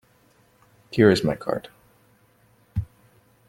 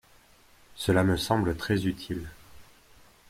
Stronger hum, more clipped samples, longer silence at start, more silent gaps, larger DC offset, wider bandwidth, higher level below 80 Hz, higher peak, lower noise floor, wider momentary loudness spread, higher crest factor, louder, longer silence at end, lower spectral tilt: neither; neither; first, 0.9 s vs 0.75 s; neither; neither; about the same, 16 kHz vs 16 kHz; about the same, -50 dBFS vs -50 dBFS; first, -2 dBFS vs -10 dBFS; about the same, -60 dBFS vs -58 dBFS; about the same, 15 LU vs 13 LU; about the same, 24 dB vs 20 dB; first, -23 LUFS vs -28 LUFS; about the same, 0.65 s vs 0.65 s; about the same, -6.5 dB/octave vs -6 dB/octave